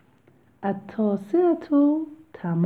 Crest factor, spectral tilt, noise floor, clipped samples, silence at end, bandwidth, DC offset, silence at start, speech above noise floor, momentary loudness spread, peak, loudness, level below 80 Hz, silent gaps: 14 dB; -10.5 dB/octave; -58 dBFS; under 0.1%; 0 s; 4.5 kHz; under 0.1%; 0.6 s; 36 dB; 12 LU; -10 dBFS; -24 LUFS; -70 dBFS; none